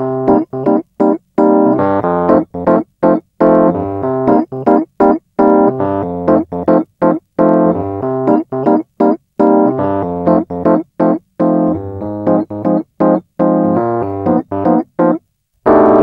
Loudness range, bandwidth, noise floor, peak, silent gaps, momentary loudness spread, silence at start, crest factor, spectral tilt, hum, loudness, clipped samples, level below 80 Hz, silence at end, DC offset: 2 LU; 5 kHz; -36 dBFS; 0 dBFS; none; 6 LU; 0 s; 12 dB; -11 dB/octave; none; -13 LUFS; under 0.1%; -46 dBFS; 0 s; under 0.1%